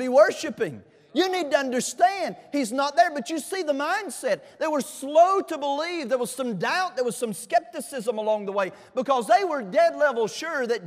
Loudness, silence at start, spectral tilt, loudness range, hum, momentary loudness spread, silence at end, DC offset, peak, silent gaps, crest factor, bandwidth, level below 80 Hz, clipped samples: -25 LUFS; 0 s; -3.5 dB/octave; 3 LU; none; 9 LU; 0 s; under 0.1%; -6 dBFS; none; 18 dB; 15.5 kHz; -78 dBFS; under 0.1%